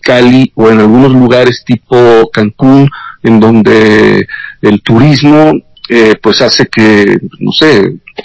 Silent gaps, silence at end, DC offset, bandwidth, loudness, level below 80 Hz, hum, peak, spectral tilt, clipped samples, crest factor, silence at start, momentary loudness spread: none; 0.05 s; under 0.1%; 8 kHz; -6 LUFS; -38 dBFS; none; 0 dBFS; -6.5 dB/octave; 20%; 6 dB; 0.05 s; 7 LU